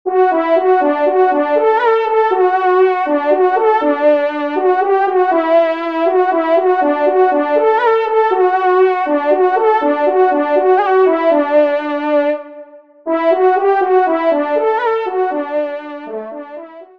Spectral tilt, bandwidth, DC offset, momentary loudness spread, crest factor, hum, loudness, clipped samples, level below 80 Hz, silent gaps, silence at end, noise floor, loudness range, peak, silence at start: -5 dB/octave; 5.2 kHz; 0.3%; 7 LU; 12 dB; none; -13 LUFS; under 0.1%; -68 dBFS; none; 0.15 s; -37 dBFS; 2 LU; -2 dBFS; 0.05 s